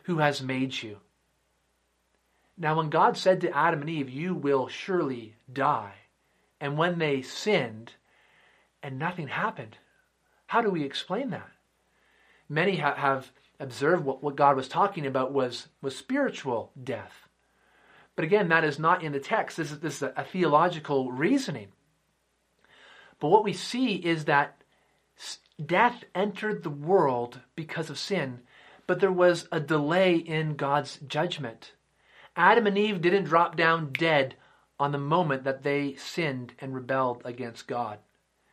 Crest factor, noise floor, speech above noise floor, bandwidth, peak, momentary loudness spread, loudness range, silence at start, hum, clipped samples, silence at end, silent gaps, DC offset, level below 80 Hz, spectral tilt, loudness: 22 dB; -73 dBFS; 46 dB; 13.5 kHz; -6 dBFS; 14 LU; 6 LU; 0.05 s; none; under 0.1%; 0.55 s; none; under 0.1%; -74 dBFS; -5.5 dB/octave; -27 LUFS